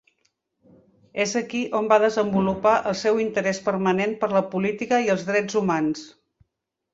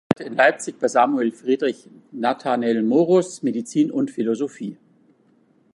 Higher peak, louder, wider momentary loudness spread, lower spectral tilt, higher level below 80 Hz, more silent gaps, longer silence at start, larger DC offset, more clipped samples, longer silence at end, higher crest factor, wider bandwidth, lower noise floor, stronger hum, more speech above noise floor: second, -4 dBFS vs 0 dBFS; about the same, -22 LUFS vs -21 LUFS; second, 6 LU vs 9 LU; about the same, -5 dB/octave vs -5.5 dB/octave; first, -60 dBFS vs -66 dBFS; neither; first, 1.15 s vs 0.1 s; neither; neither; second, 0.85 s vs 1 s; about the same, 20 dB vs 20 dB; second, 8 kHz vs 11.5 kHz; first, -81 dBFS vs -59 dBFS; neither; first, 58 dB vs 38 dB